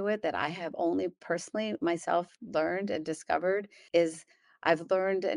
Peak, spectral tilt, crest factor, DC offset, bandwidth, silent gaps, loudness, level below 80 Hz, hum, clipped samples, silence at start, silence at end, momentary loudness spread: -10 dBFS; -5 dB/octave; 22 dB; under 0.1%; 11.5 kHz; none; -31 LUFS; -72 dBFS; none; under 0.1%; 0 s; 0 s; 6 LU